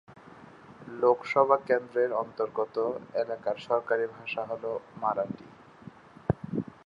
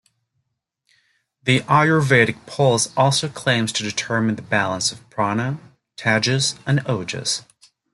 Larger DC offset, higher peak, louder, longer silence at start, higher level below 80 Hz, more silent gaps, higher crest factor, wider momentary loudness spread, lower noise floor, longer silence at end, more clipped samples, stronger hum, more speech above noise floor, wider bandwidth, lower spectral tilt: neither; second, -8 dBFS vs -2 dBFS; second, -29 LUFS vs -19 LUFS; second, 0.1 s vs 1.45 s; about the same, -58 dBFS vs -58 dBFS; neither; about the same, 22 dB vs 20 dB; first, 19 LU vs 9 LU; second, -51 dBFS vs -75 dBFS; second, 0.2 s vs 0.55 s; neither; neither; second, 22 dB vs 55 dB; second, 7.6 kHz vs 12 kHz; first, -7.5 dB/octave vs -4 dB/octave